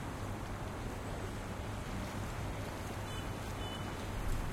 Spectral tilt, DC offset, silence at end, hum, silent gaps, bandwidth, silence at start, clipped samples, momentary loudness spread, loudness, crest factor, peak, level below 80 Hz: -5 dB/octave; under 0.1%; 0 s; none; none; 16.5 kHz; 0 s; under 0.1%; 1 LU; -42 LUFS; 14 dB; -26 dBFS; -46 dBFS